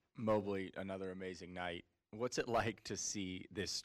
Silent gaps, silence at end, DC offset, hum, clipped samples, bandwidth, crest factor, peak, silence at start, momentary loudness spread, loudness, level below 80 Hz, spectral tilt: none; 0 s; under 0.1%; none; under 0.1%; 15.5 kHz; 16 dB; -26 dBFS; 0.15 s; 9 LU; -42 LUFS; -66 dBFS; -4 dB/octave